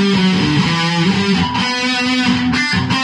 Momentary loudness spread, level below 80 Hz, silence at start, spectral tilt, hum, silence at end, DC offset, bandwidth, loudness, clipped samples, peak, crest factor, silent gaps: 2 LU; -44 dBFS; 0 s; -5 dB/octave; none; 0 s; under 0.1%; 11 kHz; -14 LUFS; under 0.1%; -2 dBFS; 12 dB; none